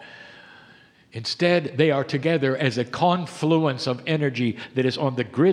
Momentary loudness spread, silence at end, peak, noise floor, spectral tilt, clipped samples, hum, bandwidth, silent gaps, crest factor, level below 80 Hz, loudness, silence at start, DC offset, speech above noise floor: 7 LU; 0 s; -4 dBFS; -53 dBFS; -6.5 dB/octave; under 0.1%; none; 11 kHz; none; 18 dB; -68 dBFS; -23 LUFS; 0 s; under 0.1%; 31 dB